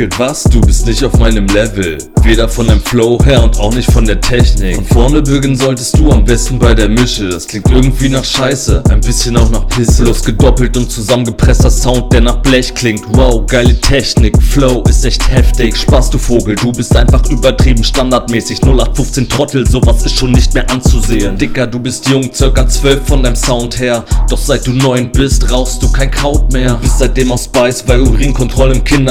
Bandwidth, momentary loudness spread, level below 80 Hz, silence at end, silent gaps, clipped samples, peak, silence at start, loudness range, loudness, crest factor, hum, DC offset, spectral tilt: 15.5 kHz; 4 LU; -12 dBFS; 0 s; none; 2%; 0 dBFS; 0 s; 2 LU; -10 LUFS; 8 dB; none; under 0.1%; -5 dB/octave